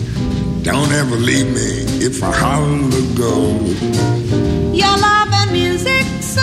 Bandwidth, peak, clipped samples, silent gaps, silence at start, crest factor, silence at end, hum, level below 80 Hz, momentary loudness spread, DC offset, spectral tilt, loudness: 15.5 kHz; 0 dBFS; under 0.1%; none; 0 s; 14 dB; 0 s; none; -30 dBFS; 6 LU; under 0.1%; -5 dB/octave; -15 LUFS